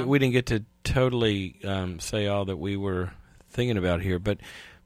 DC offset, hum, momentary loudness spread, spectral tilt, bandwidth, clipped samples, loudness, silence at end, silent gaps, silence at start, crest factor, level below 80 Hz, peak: under 0.1%; none; 9 LU; -6 dB/octave; 15 kHz; under 0.1%; -27 LUFS; 0.15 s; none; 0 s; 18 dB; -44 dBFS; -8 dBFS